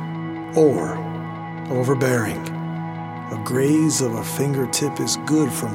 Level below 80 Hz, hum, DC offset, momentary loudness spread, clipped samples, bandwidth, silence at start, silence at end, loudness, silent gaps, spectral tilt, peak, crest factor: -58 dBFS; none; under 0.1%; 12 LU; under 0.1%; 17 kHz; 0 s; 0 s; -22 LUFS; none; -5 dB/octave; -4 dBFS; 18 dB